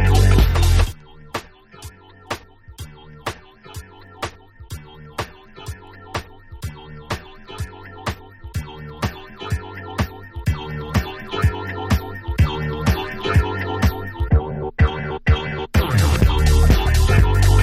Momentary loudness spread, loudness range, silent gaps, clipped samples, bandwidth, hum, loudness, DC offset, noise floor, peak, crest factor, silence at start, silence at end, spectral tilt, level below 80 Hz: 22 LU; 15 LU; none; under 0.1%; 15.5 kHz; none; -21 LUFS; under 0.1%; -40 dBFS; -2 dBFS; 18 dB; 0 s; 0 s; -6 dB/octave; -24 dBFS